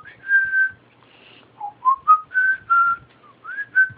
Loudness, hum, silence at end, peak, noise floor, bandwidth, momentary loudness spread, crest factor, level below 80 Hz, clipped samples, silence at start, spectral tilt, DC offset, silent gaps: -18 LUFS; none; 0.05 s; -4 dBFS; -52 dBFS; 4.3 kHz; 16 LU; 16 dB; -66 dBFS; under 0.1%; 0.25 s; -6 dB/octave; under 0.1%; none